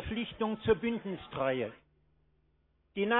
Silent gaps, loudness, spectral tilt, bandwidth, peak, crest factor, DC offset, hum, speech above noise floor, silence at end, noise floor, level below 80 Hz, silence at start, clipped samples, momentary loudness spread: none; -34 LUFS; -4 dB/octave; 4.1 kHz; -14 dBFS; 20 dB; under 0.1%; 50 Hz at -65 dBFS; 39 dB; 0 s; -72 dBFS; -56 dBFS; 0 s; under 0.1%; 10 LU